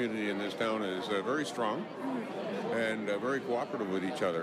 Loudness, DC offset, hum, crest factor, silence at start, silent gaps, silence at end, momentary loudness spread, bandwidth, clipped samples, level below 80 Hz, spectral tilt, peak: -34 LUFS; under 0.1%; none; 14 dB; 0 s; none; 0 s; 5 LU; 15 kHz; under 0.1%; -80 dBFS; -5 dB/octave; -20 dBFS